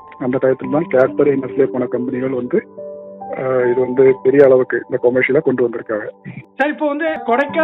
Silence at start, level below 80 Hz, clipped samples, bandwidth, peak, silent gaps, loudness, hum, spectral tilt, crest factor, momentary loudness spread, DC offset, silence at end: 0.05 s; -60 dBFS; under 0.1%; 4 kHz; 0 dBFS; none; -16 LUFS; none; -9 dB/octave; 16 dB; 16 LU; under 0.1%; 0 s